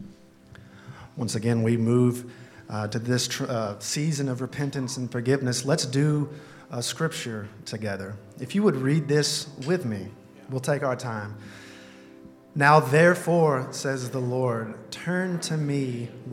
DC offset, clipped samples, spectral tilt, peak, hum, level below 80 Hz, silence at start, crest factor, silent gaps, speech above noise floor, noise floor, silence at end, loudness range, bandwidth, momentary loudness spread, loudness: under 0.1%; under 0.1%; -5 dB/octave; -2 dBFS; none; -68 dBFS; 0 s; 24 dB; none; 25 dB; -50 dBFS; 0 s; 5 LU; 16 kHz; 16 LU; -26 LUFS